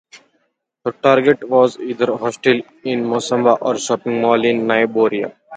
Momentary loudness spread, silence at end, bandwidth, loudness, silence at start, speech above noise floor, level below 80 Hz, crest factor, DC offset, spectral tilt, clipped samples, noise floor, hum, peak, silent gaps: 7 LU; 0 s; 9.4 kHz; -17 LUFS; 0.15 s; 51 dB; -64 dBFS; 16 dB; under 0.1%; -5 dB/octave; under 0.1%; -67 dBFS; none; 0 dBFS; none